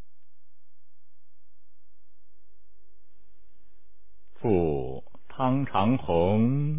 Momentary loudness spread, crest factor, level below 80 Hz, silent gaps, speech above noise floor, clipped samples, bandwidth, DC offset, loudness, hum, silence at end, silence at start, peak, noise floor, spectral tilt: 14 LU; 20 dB; -50 dBFS; none; 49 dB; under 0.1%; 3.8 kHz; 2%; -26 LUFS; none; 0 s; 4.4 s; -10 dBFS; -73 dBFS; -11.5 dB/octave